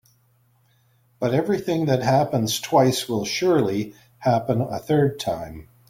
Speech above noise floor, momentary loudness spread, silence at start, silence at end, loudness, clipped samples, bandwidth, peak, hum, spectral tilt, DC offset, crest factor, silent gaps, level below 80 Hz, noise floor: 40 dB; 9 LU; 1.2 s; 0.25 s; -22 LUFS; under 0.1%; 16.5 kHz; -6 dBFS; none; -5.5 dB/octave; under 0.1%; 18 dB; none; -56 dBFS; -62 dBFS